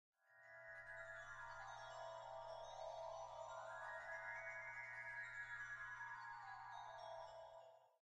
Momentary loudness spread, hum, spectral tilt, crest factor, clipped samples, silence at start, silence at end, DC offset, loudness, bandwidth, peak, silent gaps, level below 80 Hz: 8 LU; none; -2 dB/octave; 14 dB; under 0.1%; 0.25 s; 0.1 s; under 0.1%; -53 LUFS; 9.6 kHz; -40 dBFS; none; -76 dBFS